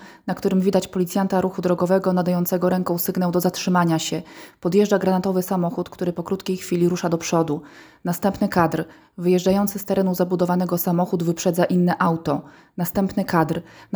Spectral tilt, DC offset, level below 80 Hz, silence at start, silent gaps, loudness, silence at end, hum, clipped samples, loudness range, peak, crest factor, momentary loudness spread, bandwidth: -6.5 dB/octave; under 0.1%; -54 dBFS; 0 s; none; -21 LUFS; 0 s; none; under 0.1%; 2 LU; -4 dBFS; 18 dB; 8 LU; over 20 kHz